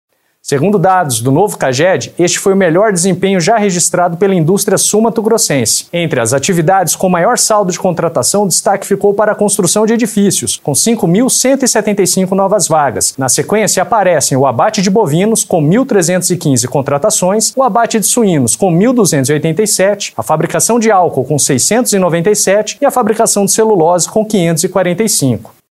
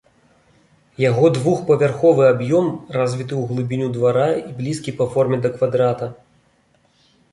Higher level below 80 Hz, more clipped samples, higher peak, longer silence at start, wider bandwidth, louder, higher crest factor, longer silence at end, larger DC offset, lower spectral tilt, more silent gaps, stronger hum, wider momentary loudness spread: first, -52 dBFS vs -58 dBFS; neither; first, 0 dBFS vs -4 dBFS; second, 0.45 s vs 1 s; first, 16 kHz vs 11.5 kHz; first, -10 LUFS vs -18 LUFS; second, 10 dB vs 16 dB; second, 0.3 s vs 1.2 s; neither; second, -4 dB/octave vs -7.5 dB/octave; neither; neither; second, 3 LU vs 9 LU